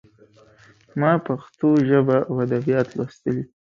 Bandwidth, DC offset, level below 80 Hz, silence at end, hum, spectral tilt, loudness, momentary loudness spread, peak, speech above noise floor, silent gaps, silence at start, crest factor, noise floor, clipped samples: 7.2 kHz; under 0.1%; -60 dBFS; 0.25 s; none; -9 dB/octave; -21 LUFS; 10 LU; -4 dBFS; 33 dB; none; 0.95 s; 18 dB; -53 dBFS; under 0.1%